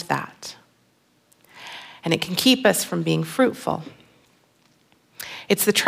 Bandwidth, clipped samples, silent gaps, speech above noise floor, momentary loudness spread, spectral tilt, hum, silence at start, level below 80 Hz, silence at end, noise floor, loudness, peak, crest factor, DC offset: 16.5 kHz; under 0.1%; none; 42 dB; 20 LU; -3.5 dB/octave; none; 0 s; -66 dBFS; 0 s; -63 dBFS; -21 LUFS; -2 dBFS; 24 dB; under 0.1%